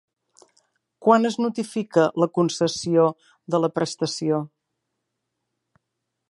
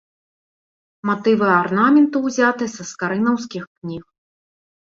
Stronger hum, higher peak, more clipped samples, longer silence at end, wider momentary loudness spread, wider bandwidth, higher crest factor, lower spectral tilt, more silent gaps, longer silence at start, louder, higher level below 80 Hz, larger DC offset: neither; about the same, -4 dBFS vs -2 dBFS; neither; first, 1.85 s vs 0.85 s; second, 8 LU vs 17 LU; first, 11.5 kHz vs 7.6 kHz; about the same, 20 dB vs 18 dB; about the same, -5.5 dB/octave vs -5.5 dB/octave; second, none vs 3.67-3.76 s; about the same, 1 s vs 1.05 s; second, -22 LUFS vs -18 LUFS; second, -70 dBFS vs -62 dBFS; neither